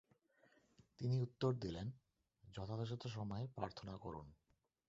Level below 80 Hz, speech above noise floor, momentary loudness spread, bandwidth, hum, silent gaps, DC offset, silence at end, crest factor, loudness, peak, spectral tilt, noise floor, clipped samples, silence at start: -68 dBFS; 31 dB; 14 LU; 7.6 kHz; none; none; under 0.1%; 0.55 s; 20 dB; -45 LUFS; -26 dBFS; -7 dB/octave; -75 dBFS; under 0.1%; 1 s